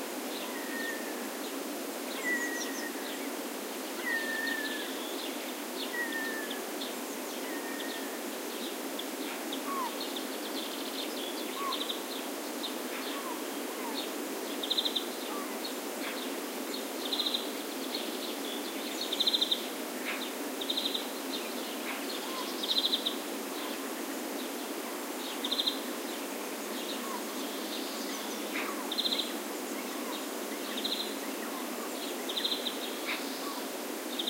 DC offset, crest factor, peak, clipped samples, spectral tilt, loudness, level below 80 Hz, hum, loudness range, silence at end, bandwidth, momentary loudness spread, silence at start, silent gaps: under 0.1%; 22 dB; -14 dBFS; under 0.1%; -1 dB/octave; -34 LUFS; under -90 dBFS; none; 4 LU; 0 s; 16 kHz; 7 LU; 0 s; none